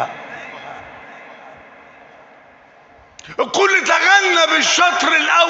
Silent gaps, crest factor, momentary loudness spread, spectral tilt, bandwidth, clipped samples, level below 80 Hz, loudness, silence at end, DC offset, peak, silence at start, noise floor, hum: none; 18 dB; 23 LU; 0 dB/octave; 8.4 kHz; under 0.1%; -64 dBFS; -13 LUFS; 0 s; under 0.1%; 0 dBFS; 0 s; -47 dBFS; none